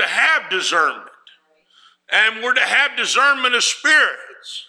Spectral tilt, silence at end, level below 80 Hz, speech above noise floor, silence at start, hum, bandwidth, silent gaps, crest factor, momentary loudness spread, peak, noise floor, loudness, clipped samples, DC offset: 1 dB/octave; 0.05 s; -80 dBFS; 39 dB; 0 s; 60 Hz at -75 dBFS; 15 kHz; none; 16 dB; 7 LU; -2 dBFS; -56 dBFS; -15 LUFS; under 0.1%; under 0.1%